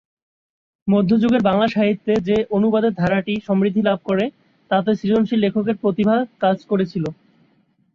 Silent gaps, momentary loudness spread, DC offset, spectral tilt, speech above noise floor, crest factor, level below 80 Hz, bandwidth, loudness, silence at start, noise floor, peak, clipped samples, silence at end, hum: none; 5 LU; under 0.1%; -8.5 dB/octave; 43 dB; 14 dB; -54 dBFS; 6.8 kHz; -19 LUFS; 0.85 s; -61 dBFS; -4 dBFS; under 0.1%; 0.8 s; none